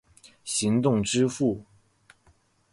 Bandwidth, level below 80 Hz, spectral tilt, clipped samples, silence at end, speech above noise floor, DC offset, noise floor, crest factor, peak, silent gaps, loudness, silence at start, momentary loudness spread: 11.5 kHz; -58 dBFS; -5 dB/octave; under 0.1%; 1.1 s; 39 dB; under 0.1%; -63 dBFS; 16 dB; -12 dBFS; none; -25 LUFS; 0.45 s; 11 LU